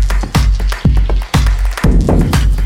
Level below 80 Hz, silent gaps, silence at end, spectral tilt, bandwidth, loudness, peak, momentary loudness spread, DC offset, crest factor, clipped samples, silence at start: -12 dBFS; none; 0 s; -6 dB/octave; 15.5 kHz; -14 LUFS; 0 dBFS; 3 LU; under 0.1%; 10 dB; under 0.1%; 0 s